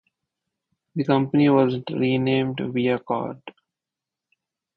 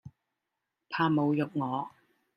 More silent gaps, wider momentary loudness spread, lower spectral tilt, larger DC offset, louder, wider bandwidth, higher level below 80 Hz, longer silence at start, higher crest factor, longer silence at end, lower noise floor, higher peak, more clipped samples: neither; about the same, 12 LU vs 11 LU; about the same, -9.5 dB/octave vs -9 dB/octave; neither; first, -22 LUFS vs -30 LUFS; second, 5.2 kHz vs 5.8 kHz; first, -64 dBFS vs -74 dBFS; first, 0.95 s vs 0.05 s; about the same, 18 dB vs 20 dB; first, 1.25 s vs 0.5 s; about the same, -88 dBFS vs -86 dBFS; first, -6 dBFS vs -14 dBFS; neither